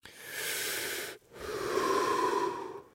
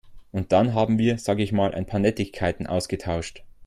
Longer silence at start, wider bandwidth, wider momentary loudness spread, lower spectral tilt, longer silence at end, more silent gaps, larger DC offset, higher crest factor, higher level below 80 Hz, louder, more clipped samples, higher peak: about the same, 0.05 s vs 0.05 s; first, 16 kHz vs 13.5 kHz; first, 12 LU vs 9 LU; second, -2 dB/octave vs -6.5 dB/octave; about the same, 0.05 s vs 0 s; neither; neither; about the same, 16 dB vs 18 dB; second, -66 dBFS vs -48 dBFS; second, -33 LUFS vs -24 LUFS; neither; second, -16 dBFS vs -6 dBFS